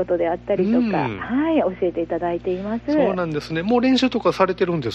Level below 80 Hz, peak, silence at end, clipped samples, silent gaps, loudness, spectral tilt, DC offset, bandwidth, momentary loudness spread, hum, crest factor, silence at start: -48 dBFS; -4 dBFS; 0 s; under 0.1%; none; -21 LUFS; -7 dB/octave; under 0.1%; 8.4 kHz; 6 LU; 60 Hz at -40 dBFS; 16 dB; 0 s